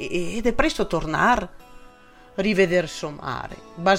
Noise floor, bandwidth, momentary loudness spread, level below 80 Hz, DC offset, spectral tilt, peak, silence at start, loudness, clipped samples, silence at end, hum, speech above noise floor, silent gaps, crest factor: -48 dBFS; 16 kHz; 13 LU; -38 dBFS; under 0.1%; -5 dB/octave; -4 dBFS; 0 s; -23 LUFS; under 0.1%; 0 s; none; 26 dB; none; 18 dB